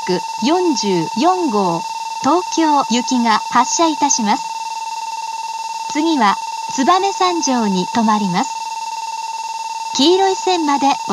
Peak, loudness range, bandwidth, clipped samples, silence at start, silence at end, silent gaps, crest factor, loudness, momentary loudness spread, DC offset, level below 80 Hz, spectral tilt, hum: 0 dBFS; 2 LU; 12.5 kHz; under 0.1%; 0 s; 0 s; none; 16 dB; -17 LUFS; 10 LU; under 0.1%; -72 dBFS; -3.5 dB/octave; none